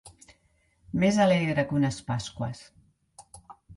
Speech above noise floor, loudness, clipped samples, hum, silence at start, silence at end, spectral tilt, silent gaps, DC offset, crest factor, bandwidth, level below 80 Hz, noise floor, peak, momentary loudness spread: 42 dB; -26 LUFS; under 0.1%; none; 0.05 s; 0.05 s; -6 dB/octave; none; under 0.1%; 20 dB; 11.5 kHz; -56 dBFS; -67 dBFS; -10 dBFS; 13 LU